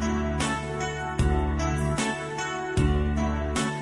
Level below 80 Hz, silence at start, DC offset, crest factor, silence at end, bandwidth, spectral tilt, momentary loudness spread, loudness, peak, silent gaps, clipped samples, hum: -32 dBFS; 0 s; under 0.1%; 16 dB; 0 s; 11.5 kHz; -5.5 dB/octave; 5 LU; -27 LUFS; -10 dBFS; none; under 0.1%; none